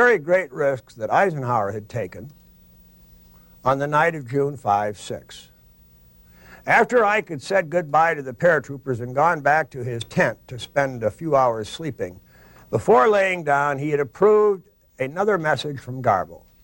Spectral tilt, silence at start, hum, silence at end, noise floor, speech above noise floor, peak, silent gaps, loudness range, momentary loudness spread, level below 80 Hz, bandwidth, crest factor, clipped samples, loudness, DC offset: -6 dB/octave; 0 s; none; 0.25 s; -53 dBFS; 32 dB; -6 dBFS; none; 5 LU; 14 LU; -56 dBFS; 16.5 kHz; 16 dB; under 0.1%; -21 LUFS; under 0.1%